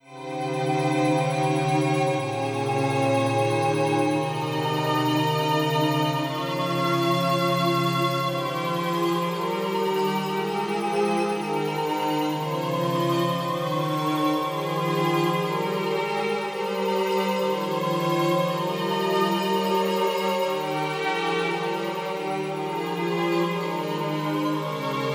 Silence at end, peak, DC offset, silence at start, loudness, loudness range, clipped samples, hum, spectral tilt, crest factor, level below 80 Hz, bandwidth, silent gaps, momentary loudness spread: 0 s; -10 dBFS; under 0.1%; 0.05 s; -25 LUFS; 3 LU; under 0.1%; none; -5.5 dB/octave; 14 dB; -76 dBFS; 20 kHz; none; 5 LU